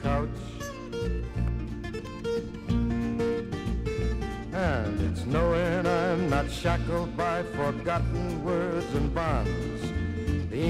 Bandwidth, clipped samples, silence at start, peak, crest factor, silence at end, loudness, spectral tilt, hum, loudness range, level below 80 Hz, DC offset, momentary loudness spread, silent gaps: 13.5 kHz; under 0.1%; 0 s; -12 dBFS; 16 dB; 0 s; -29 LUFS; -7 dB/octave; none; 4 LU; -36 dBFS; under 0.1%; 8 LU; none